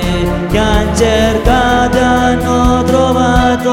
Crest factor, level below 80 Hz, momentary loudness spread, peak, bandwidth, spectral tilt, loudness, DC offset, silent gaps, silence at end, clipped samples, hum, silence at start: 10 dB; -20 dBFS; 3 LU; 0 dBFS; 16.5 kHz; -5.5 dB/octave; -11 LUFS; under 0.1%; none; 0 s; 0.1%; none; 0 s